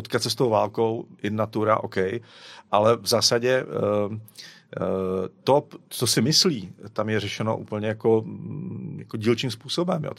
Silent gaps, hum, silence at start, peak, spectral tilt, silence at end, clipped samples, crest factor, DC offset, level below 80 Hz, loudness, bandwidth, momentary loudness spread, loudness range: none; none; 0 s; -6 dBFS; -4.5 dB/octave; 0.05 s; under 0.1%; 18 dB; under 0.1%; -68 dBFS; -24 LUFS; 16 kHz; 15 LU; 3 LU